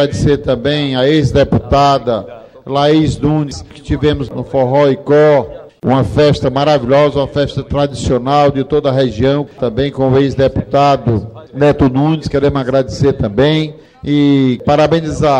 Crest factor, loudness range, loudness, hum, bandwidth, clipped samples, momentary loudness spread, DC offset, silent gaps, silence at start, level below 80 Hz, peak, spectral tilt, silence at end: 12 dB; 2 LU; -13 LUFS; none; 10 kHz; under 0.1%; 8 LU; under 0.1%; none; 0 s; -32 dBFS; 0 dBFS; -7 dB/octave; 0 s